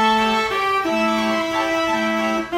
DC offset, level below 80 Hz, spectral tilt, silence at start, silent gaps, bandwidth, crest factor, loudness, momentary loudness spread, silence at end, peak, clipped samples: under 0.1%; -50 dBFS; -3.5 dB/octave; 0 s; none; 16.5 kHz; 12 dB; -19 LUFS; 3 LU; 0 s; -6 dBFS; under 0.1%